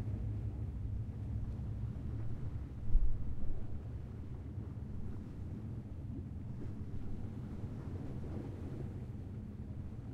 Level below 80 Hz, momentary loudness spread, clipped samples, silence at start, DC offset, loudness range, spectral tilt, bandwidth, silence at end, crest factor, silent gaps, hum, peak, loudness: -42 dBFS; 6 LU; under 0.1%; 0 s; under 0.1%; 4 LU; -9.5 dB/octave; 3.5 kHz; 0 s; 22 dB; none; none; -16 dBFS; -44 LUFS